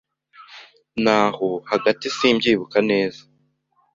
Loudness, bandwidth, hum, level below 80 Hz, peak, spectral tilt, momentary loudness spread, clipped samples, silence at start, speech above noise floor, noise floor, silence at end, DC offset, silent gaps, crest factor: -20 LUFS; 7.8 kHz; none; -60 dBFS; -2 dBFS; -4.5 dB/octave; 9 LU; under 0.1%; 0.4 s; 46 dB; -65 dBFS; 0.8 s; under 0.1%; none; 20 dB